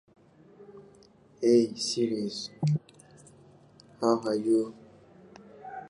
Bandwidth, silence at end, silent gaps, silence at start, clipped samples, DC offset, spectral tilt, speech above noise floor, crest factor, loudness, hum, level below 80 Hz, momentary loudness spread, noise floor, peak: 11.5 kHz; 0 s; none; 0.6 s; under 0.1%; under 0.1%; -6 dB/octave; 31 dB; 20 dB; -28 LUFS; none; -74 dBFS; 12 LU; -58 dBFS; -10 dBFS